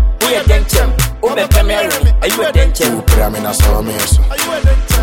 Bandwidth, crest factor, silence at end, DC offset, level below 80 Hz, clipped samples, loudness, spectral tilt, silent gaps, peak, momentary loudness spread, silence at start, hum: 17 kHz; 10 dB; 0 s; under 0.1%; -12 dBFS; under 0.1%; -13 LUFS; -4.5 dB/octave; none; 0 dBFS; 3 LU; 0 s; none